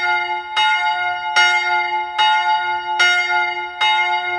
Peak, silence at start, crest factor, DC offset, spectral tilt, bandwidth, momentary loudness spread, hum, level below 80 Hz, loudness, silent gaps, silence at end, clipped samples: 0 dBFS; 0 s; 18 dB; under 0.1%; 0 dB/octave; 11 kHz; 7 LU; none; -60 dBFS; -16 LUFS; none; 0 s; under 0.1%